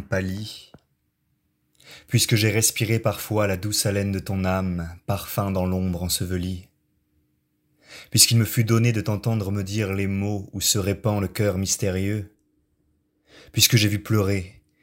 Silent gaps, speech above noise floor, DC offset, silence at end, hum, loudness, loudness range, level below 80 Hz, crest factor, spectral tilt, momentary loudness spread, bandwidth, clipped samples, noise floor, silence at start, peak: none; 49 dB; under 0.1%; 0.3 s; none; -22 LUFS; 5 LU; -54 dBFS; 22 dB; -4 dB/octave; 12 LU; 16 kHz; under 0.1%; -71 dBFS; 0 s; -2 dBFS